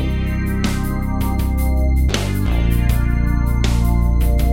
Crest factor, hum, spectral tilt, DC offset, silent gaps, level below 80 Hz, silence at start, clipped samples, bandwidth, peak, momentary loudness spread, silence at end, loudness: 14 dB; none; -6.5 dB/octave; under 0.1%; none; -18 dBFS; 0 s; under 0.1%; 16.5 kHz; -2 dBFS; 4 LU; 0 s; -19 LUFS